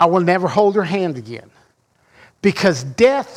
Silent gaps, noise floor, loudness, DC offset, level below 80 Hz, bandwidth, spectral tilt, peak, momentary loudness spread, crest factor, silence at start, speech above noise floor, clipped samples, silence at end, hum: none; -59 dBFS; -17 LUFS; under 0.1%; -56 dBFS; 13.5 kHz; -6 dB/octave; -2 dBFS; 14 LU; 16 dB; 0 s; 43 dB; under 0.1%; 0 s; none